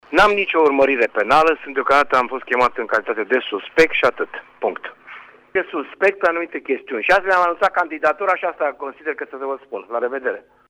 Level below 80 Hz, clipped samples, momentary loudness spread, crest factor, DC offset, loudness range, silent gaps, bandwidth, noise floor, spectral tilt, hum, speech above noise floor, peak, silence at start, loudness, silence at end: -50 dBFS; under 0.1%; 13 LU; 14 dB; under 0.1%; 4 LU; none; 14.5 kHz; -41 dBFS; -4 dB/octave; none; 22 dB; -4 dBFS; 0.1 s; -19 LUFS; 0.3 s